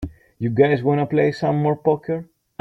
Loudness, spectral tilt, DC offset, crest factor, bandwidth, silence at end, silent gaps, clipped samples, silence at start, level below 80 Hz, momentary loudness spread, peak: -20 LUFS; -9 dB/octave; under 0.1%; 18 dB; 7.6 kHz; 0.4 s; none; under 0.1%; 0 s; -48 dBFS; 12 LU; -2 dBFS